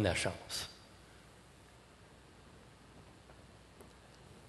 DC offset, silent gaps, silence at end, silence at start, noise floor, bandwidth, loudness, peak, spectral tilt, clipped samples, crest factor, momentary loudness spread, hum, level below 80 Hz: under 0.1%; none; 0 s; 0 s; -60 dBFS; 12 kHz; -39 LUFS; -16 dBFS; -4 dB/octave; under 0.1%; 28 dB; 21 LU; none; -58 dBFS